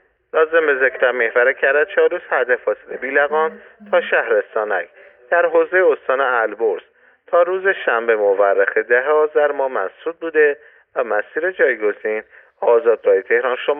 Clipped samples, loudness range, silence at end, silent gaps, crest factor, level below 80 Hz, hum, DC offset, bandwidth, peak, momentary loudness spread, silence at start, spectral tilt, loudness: under 0.1%; 2 LU; 0 s; none; 14 dB; -70 dBFS; none; under 0.1%; 3.7 kHz; -4 dBFS; 8 LU; 0.35 s; -7.5 dB/octave; -17 LUFS